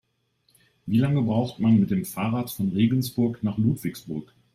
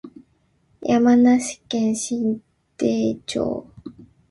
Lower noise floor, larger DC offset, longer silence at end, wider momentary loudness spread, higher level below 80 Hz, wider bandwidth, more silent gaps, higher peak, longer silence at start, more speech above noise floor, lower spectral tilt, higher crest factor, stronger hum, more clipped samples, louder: first, -69 dBFS vs -63 dBFS; neither; about the same, 0.3 s vs 0.4 s; second, 12 LU vs 17 LU; about the same, -58 dBFS vs -56 dBFS; first, 16 kHz vs 11.5 kHz; neither; second, -10 dBFS vs -6 dBFS; first, 0.85 s vs 0.05 s; about the same, 46 dB vs 44 dB; first, -7.5 dB/octave vs -5 dB/octave; about the same, 16 dB vs 16 dB; neither; neither; second, -24 LUFS vs -21 LUFS